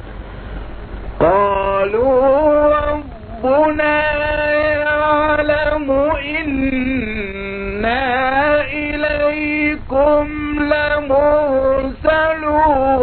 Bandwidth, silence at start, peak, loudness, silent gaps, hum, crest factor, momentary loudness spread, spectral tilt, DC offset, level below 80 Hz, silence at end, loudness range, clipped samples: 4.5 kHz; 0 s; -2 dBFS; -16 LUFS; none; none; 14 dB; 10 LU; -9.5 dB/octave; under 0.1%; -32 dBFS; 0 s; 3 LU; under 0.1%